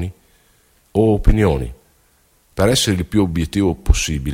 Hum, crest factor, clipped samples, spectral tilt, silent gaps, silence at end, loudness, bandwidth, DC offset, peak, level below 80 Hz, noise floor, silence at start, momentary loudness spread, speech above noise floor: none; 18 dB; under 0.1%; -5 dB/octave; none; 0 s; -17 LUFS; 16.5 kHz; under 0.1%; 0 dBFS; -24 dBFS; -57 dBFS; 0 s; 9 LU; 41 dB